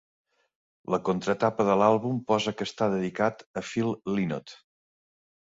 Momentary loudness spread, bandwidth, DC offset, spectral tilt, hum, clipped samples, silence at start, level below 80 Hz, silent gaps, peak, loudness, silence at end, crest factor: 10 LU; 8 kHz; under 0.1%; -6 dB/octave; none; under 0.1%; 0.9 s; -64 dBFS; 3.46-3.54 s; -6 dBFS; -27 LUFS; 0.9 s; 22 dB